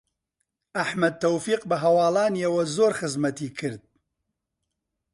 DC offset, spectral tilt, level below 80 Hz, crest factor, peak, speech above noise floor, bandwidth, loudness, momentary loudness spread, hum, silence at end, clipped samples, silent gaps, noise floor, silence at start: under 0.1%; -5 dB/octave; -68 dBFS; 16 dB; -10 dBFS; 58 dB; 11.5 kHz; -24 LUFS; 12 LU; none; 1.35 s; under 0.1%; none; -82 dBFS; 0.75 s